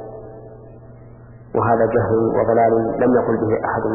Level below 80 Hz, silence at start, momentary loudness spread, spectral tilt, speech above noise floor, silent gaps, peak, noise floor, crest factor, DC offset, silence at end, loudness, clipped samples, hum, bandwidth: -46 dBFS; 0 s; 20 LU; -14 dB/octave; 24 dB; none; -4 dBFS; -41 dBFS; 14 dB; under 0.1%; 0 s; -17 LUFS; under 0.1%; none; 2.9 kHz